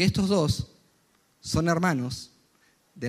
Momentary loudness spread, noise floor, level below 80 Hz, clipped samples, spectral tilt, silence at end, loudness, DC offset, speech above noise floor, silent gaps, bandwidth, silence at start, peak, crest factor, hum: 18 LU; -66 dBFS; -48 dBFS; under 0.1%; -5.5 dB/octave; 0 s; -26 LUFS; under 0.1%; 41 dB; none; 15 kHz; 0 s; -10 dBFS; 18 dB; none